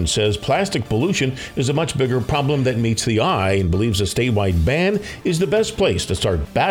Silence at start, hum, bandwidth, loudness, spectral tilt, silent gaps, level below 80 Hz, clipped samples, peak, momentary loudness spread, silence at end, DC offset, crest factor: 0 s; none; 17 kHz; -19 LUFS; -5 dB/octave; none; -34 dBFS; under 0.1%; -6 dBFS; 3 LU; 0 s; under 0.1%; 14 dB